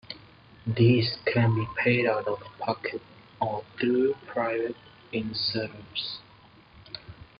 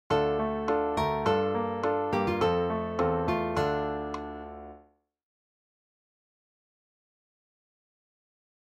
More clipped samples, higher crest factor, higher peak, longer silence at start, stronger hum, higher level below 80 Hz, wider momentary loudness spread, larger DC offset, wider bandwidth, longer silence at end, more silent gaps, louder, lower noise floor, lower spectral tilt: neither; about the same, 18 dB vs 18 dB; about the same, -10 dBFS vs -12 dBFS; about the same, 0.1 s vs 0.1 s; neither; second, -62 dBFS vs -52 dBFS; first, 18 LU vs 12 LU; neither; second, 5.4 kHz vs 13.5 kHz; second, 0.15 s vs 3.9 s; neither; about the same, -27 LUFS vs -29 LUFS; second, -54 dBFS vs -61 dBFS; first, -9.5 dB/octave vs -7 dB/octave